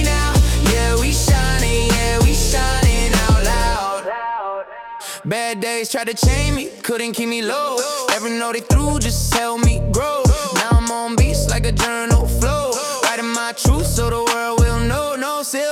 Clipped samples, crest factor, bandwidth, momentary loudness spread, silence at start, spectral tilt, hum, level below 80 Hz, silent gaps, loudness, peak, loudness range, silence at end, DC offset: under 0.1%; 14 dB; 17 kHz; 7 LU; 0 s; -4.5 dB/octave; none; -22 dBFS; none; -18 LUFS; -2 dBFS; 5 LU; 0 s; under 0.1%